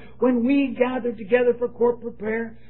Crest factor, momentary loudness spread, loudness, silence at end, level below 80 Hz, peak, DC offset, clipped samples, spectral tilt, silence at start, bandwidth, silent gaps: 18 dB; 8 LU; -22 LUFS; 0.15 s; -56 dBFS; -6 dBFS; 0.9%; under 0.1%; -10.5 dB/octave; 0 s; 4.2 kHz; none